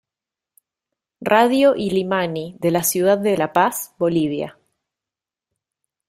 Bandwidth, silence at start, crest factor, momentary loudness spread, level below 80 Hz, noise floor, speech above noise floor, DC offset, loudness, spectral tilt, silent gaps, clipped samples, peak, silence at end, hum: 16 kHz; 1.2 s; 18 dB; 9 LU; -60 dBFS; -88 dBFS; 70 dB; under 0.1%; -19 LUFS; -4.5 dB/octave; none; under 0.1%; -2 dBFS; 1.55 s; none